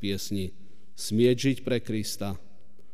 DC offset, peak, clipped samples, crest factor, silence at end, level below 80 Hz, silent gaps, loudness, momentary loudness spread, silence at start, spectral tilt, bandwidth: 2%; -12 dBFS; under 0.1%; 18 dB; 0.55 s; -58 dBFS; none; -28 LUFS; 14 LU; 0 s; -5.5 dB/octave; 15.5 kHz